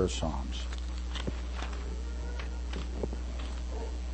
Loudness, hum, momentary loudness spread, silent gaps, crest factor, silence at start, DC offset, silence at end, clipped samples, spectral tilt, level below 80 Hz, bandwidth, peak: -37 LUFS; none; 4 LU; none; 18 dB; 0 s; under 0.1%; 0 s; under 0.1%; -5.5 dB/octave; -36 dBFS; 8.4 kHz; -16 dBFS